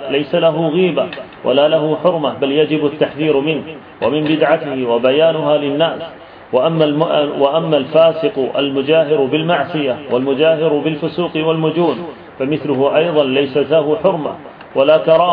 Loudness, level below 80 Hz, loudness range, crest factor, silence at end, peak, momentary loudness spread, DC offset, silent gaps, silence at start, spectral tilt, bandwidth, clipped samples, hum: -15 LUFS; -58 dBFS; 2 LU; 14 dB; 0 s; 0 dBFS; 8 LU; under 0.1%; none; 0 s; -9.5 dB/octave; 5 kHz; under 0.1%; none